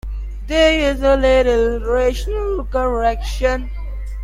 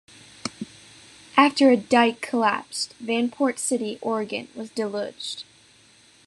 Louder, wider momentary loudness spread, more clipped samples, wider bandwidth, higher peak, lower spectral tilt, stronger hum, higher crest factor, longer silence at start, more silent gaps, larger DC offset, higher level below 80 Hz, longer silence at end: first, -17 LUFS vs -23 LUFS; about the same, 16 LU vs 17 LU; neither; about the same, 13.5 kHz vs 12.5 kHz; about the same, -2 dBFS vs -4 dBFS; first, -5.5 dB/octave vs -3 dB/octave; neither; about the same, 16 dB vs 20 dB; second, 0.05 s vs 0.45 s; neither; neither; first, -24 dBFS vs -72 dBFS; second, 0 s vs 0.85 s